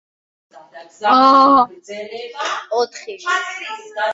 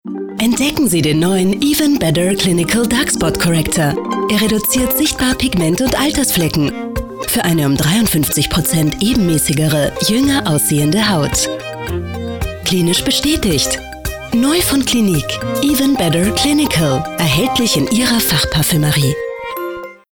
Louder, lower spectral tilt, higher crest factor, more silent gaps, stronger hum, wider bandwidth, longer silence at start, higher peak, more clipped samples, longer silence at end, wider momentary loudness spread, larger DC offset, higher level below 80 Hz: about the same, -16 LUFS vs -14 LUFS; second, -2.5 dB/octave vs -4 dB/octave; first, 16 dB vs 10 dB; neither; neither; second, 8 kHz vs over 20 kHz; first, 0.55 s vs 0.05 s; first, -2 dBFS vs -6 dBFS; neither; second, 0 s vs 0.2 s; first, 19 LU vs 9 LU; neither; second, -62 dBFS vs -32 dBFS